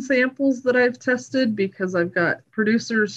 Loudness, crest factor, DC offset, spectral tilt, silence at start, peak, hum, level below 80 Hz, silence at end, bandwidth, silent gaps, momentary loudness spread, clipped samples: -21 LUFS; 12 dB; under 0.1%; -5.5 dB/octave; 0 s; -8 dBFS; none; -70 dBFS; 0 s; 8.2 kHz; none; 4 LU; under 0.1%